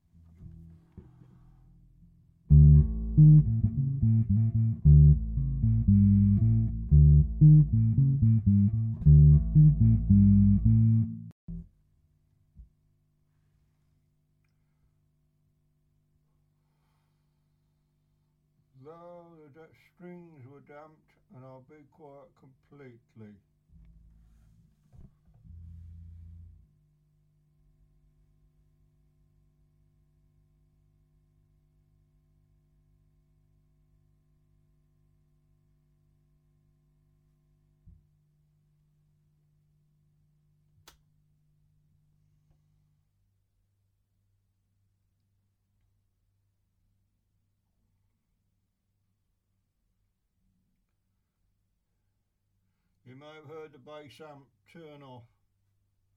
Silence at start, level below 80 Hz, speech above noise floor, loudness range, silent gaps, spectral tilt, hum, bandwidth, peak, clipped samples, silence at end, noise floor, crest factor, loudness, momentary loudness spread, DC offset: 2.5 s; -38 dBFS; 51 dB; 5 LU; 11.32-11.48 s; -12.5 dB/octave; none; 2.3 kHz; -8 dBFS; under 0.1%; 1.9 s; -77 dBFS; 20 dB; -23 LUFS; 26 LU; under 0.1%